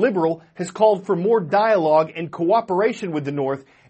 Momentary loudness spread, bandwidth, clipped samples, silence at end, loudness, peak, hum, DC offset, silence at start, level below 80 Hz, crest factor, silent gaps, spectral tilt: 9 LU; 8.4 kHz; under 0.1%; 0.3 s; -20 LUFS; -4 dBFS; none; under 0.1%; 0 s; -68 dBFS; 16 dB; none; -6.5 dB/octave